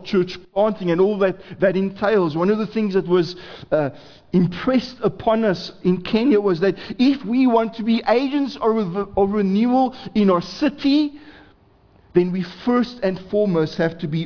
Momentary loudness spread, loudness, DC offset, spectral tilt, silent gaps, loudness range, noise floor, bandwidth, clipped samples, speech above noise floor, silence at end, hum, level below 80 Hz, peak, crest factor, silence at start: 6 LU; -20 LUFS; under 0.1%; -8 dB/octave; none; 2 LU; -53 dBFS; 5.4 kHz; under 0.1%; 34 dB; 0 s; none; -52 dBFS; -4 dBFS; 16 dB; 0 s